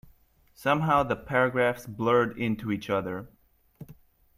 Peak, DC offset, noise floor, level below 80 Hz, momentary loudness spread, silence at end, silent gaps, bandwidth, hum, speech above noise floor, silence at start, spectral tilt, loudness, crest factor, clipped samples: -10 dBFS; under 0.1%; -60 dBFS; -56 dBFS; 8 LU; 0.45 s; none; 15.5 kHz; none; 34 dB; 0.6 s; -6.5 dB/octave; -27 LUFS; 18 dB; under 0.1%